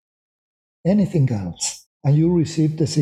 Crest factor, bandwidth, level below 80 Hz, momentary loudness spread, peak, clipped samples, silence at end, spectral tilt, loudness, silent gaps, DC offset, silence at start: 14 dB; 12.5 kHz; -52 dBFS; 8 LU; -6 dBFS; under 0.1%; 0 s; -6.5 dB/octave; -20 LUFS; 1.86-2.00 s; under 0.1%; 0.85 s